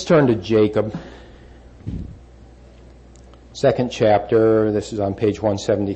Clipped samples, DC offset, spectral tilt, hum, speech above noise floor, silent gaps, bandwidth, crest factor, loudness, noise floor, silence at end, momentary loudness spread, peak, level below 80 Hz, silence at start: under 0.1%; under 0.1%; -7 dB/octave; none; 27 dB; none; 8.6 kHz; 14 dB; -18 LUFS; -44 dBFS; 0 s; 19 LU; -6 dBFS; -44 dBFS; 0 s